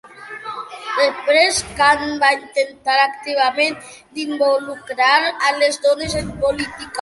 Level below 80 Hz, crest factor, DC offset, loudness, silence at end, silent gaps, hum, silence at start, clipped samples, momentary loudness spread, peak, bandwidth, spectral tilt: -46 dBFS; 18 dB; under 0.1%; -17 LUFS; 0 s; none; none; 0.05 s; under 0.1%; 15 LU; -2 dBFS; 11.5 kHz; -2.5 dB/octave